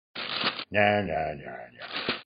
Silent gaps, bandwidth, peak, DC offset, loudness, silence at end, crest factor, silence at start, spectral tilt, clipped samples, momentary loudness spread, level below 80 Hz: none; 5.4 kHz; -8 dBFS; under 0.1%; -28 LUFS; 0.05 s; 20 dB; 0.15 s; -8.5 dB/octave; under 0.1%; 16 LU; -56 dBFS